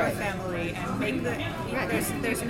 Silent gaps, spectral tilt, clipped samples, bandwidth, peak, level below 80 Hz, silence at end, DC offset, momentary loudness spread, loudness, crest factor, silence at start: none; -5 dB/octave; under 0.1%; 17 kHz; -14 dBFS; -48 dBFS; 0 s; under 0.1%; 3 LU; -29 LUFS; 14 dB; 0 s